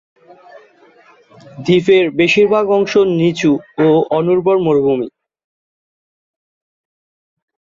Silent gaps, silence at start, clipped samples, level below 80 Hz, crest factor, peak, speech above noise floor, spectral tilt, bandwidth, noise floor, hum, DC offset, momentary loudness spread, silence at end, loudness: none; 1.55 s; under 0.1%; -56 dBFS; 14 dB; -2 dBFS; 34 dB; -6.5 dB/octave; 7.6 kHz; -47 dBFS; none; under 0.1%; 5 LU; 2.65 s; -13 LUFS